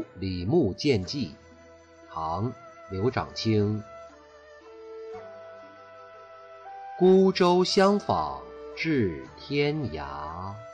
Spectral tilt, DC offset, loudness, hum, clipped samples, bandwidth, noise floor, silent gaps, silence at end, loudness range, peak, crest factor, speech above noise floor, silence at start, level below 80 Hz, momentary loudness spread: -6.5 dB/octave; under 0.1%; -26 LUFS; none; under 0.1%; 9.2 kHz; -52 dBFS; none; 0 s; 9 LU; -12 dBFS; 16 dB; 27 dB; 0 s; -54 dBFS; 25 LU